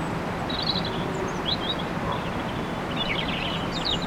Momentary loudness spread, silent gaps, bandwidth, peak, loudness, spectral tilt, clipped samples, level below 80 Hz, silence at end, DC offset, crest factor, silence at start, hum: 4 LU; none; 16.5 kHz; -12 dBFS; -27 LUFS; -5 dB/octave; under 0.1%; -42 dBFS; 0 s; under 0.1%; 16 dB; 0 s; none